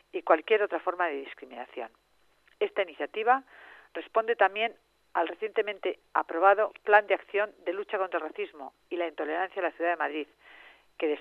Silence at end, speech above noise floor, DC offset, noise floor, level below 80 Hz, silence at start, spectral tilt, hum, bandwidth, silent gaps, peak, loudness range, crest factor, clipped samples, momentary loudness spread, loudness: 0 s; 36 dB; under 0.1%; -65 dBFS; -80 dBFS; 0.15 s; -4.5 dB/octave; none; 5.4 kHz; none; -6 dBFS; 6 LU; 24 dB; under 0.1%; 17 LU; -29 LUFS